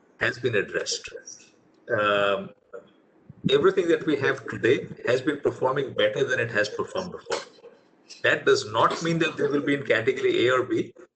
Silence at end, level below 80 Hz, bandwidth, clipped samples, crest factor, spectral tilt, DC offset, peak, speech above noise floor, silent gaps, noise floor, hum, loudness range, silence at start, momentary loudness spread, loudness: 0.1 s; -64 dBFS; 8.8 kHz; under 0.1%; 18 dB; -4.5 dB/octave; under 0.1%; -8 dBFS; 32 dB; none; -56 dBFS; none; 3 LU; 0.2 s; 10 LU; -25 LUFS